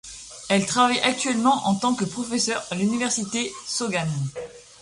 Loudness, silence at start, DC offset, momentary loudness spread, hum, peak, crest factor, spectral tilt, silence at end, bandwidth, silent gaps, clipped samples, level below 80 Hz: -23 LUFS; 0.05 s; under 0.1%; 12 LU; none; -6 dBFS; 18 dB; -3.5 dB/octave; 0.2 s; 11.5 kHz; none; under 0.1%; -60 dBFS